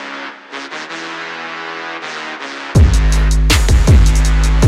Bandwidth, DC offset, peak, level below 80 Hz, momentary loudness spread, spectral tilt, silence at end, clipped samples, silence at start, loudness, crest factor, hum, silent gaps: 14 kHz; under 0.1%; -2 dBFS; -14 dBFS; 15 LU; -5 dB/octave; 0 s; under 0.1%; 0 s; -15 LUFS; 12 dB; none; none